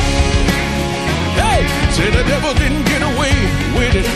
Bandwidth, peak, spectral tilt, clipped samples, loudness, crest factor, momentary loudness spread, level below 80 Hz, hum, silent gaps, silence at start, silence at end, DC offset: 14 kHz; 0 dBFS; -5 dB/octave; under 0.1%; -15 LUFS; 14 dB; 3 LU; -20 dBFS; none; none; 0 s; 0 s; under 0.1%